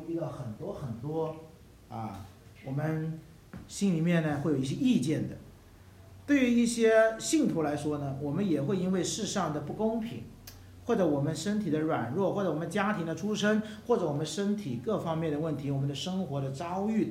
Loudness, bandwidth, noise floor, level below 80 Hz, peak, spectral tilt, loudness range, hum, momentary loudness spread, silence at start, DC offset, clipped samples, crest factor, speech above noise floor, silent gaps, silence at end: -30 LUFS; 16 kHz; -53 dBFS; -60 dBFS; -12 dBFS; -6 dB/octave; 6 LU; none; 15 LU; 0 s; under 0.1%; under 0.1%; 18 dB; 24 dB; none; 0 s